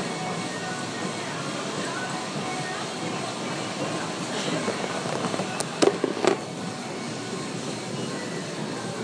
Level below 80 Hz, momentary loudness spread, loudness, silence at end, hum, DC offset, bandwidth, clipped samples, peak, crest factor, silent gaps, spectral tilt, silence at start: -68 dBFS; 7 LU; -29 LUFS; 0 s; none; under 0.1%; 10.5 kHz; under 0.1%; -2 dBFS; 26 dB; none; -4 dB/octave; 0 s